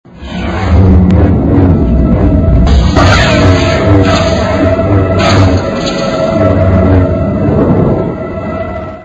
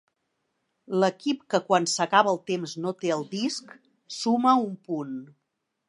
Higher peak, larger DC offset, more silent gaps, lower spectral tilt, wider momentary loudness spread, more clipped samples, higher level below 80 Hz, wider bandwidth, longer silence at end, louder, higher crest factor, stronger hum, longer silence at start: first, 0 dBFS vs -6 dBFS; neither; neither; first, -7 dB/octave vs -4 dB/octave; about the same, 10 LU vs 12 LU; first, 0.4% vs under 0.1%; first, -16 dBFS vs -80 dBFS; second, 8 kHz vs 11.5 kHz; second, 0 s vs 0.65 s; first, -9 LUFS vs -26 LUFS; second, 8 dB vs 20 dB; neither; second, 0.15 s vs 0.9 s